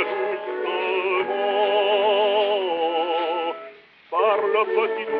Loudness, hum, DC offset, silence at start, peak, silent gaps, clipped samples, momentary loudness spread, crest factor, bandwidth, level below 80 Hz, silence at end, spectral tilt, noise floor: -22 LUFS; none; under 0.1%; 0 s; -8 dBFS; none; under 0.1%; 8 LU; 14 dB; 5 kHz; -80 dBFS; 0 s; 1 dB/octave; -44 dBFS